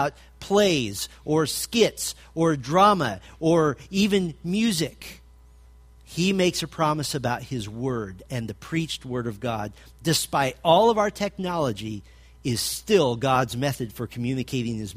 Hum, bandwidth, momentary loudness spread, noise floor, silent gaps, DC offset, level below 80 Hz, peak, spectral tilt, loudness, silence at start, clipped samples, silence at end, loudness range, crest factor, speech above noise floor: none; 15.5 kHz; 13 LU; -50 dBFS; none; under 0.1%; -50 dBFS; -6 dBFS; -4.5 dB/octave; -24 LUFS; 0 s; under 0.1%; 0 s; 5 LU; 20 dB; 26 dB